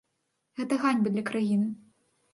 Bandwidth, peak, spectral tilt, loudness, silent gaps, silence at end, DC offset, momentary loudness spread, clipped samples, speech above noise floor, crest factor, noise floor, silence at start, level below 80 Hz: 11.5 kHz; -12 dBFS; -6.5 dB/octave; -28 LUFS; none; 0.55 s; under 0.1%; 15 LU; under 0.1%; 52 dB; 18 dB; -78 dBFS; 0.55 s; -76 dBFS